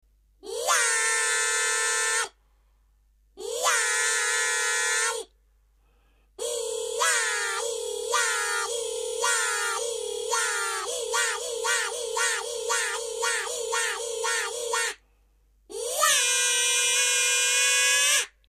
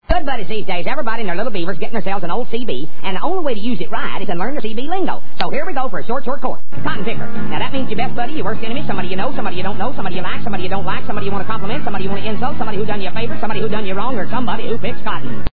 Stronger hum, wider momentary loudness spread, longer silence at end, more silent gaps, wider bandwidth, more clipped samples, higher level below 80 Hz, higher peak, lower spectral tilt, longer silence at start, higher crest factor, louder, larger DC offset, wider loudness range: neither; first, 10 LU vs 3 LU; first, 0.2 s vs 0 s; neither; first, 15.5 kHz vs 5 kHz; neither; second, -64 dBFS vs -36 dBFS; second, -8 dBFS vs 0 dBFS; second, 3.5 dB/octave vs -8.5 dB/octave; first, 0.45 s vs 0 s; about the same, 18 dB vs 22 dB; about the same, -24 LUFS vs -23 LUFS; second, under 0.1% vs 50%; first, 5 LU vs 1 LU